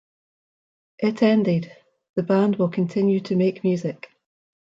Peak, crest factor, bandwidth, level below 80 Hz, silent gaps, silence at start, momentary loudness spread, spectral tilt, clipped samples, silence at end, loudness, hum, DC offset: -6 dBFS; 18 dB; 7.6 kHz; -68 dBFS; 2.09-2.14 s; 1 s; 11 LU; -8.5 dB/octave; under 0.1%; 0.8 s; -22 LUFS; none; under 0.1%